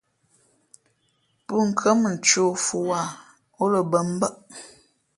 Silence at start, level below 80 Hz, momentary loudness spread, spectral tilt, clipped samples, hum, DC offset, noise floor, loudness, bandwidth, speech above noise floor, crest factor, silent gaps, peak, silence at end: 1.5 s; -68 dBFS; 21 LU; -3.5 dB/octave; under 0.1%; none; under 0.1%; -68 dBFS; -22 LUFS; 11.5 kHz; 46 dB; 22 dB; none; -4 dBFS; 0.5 s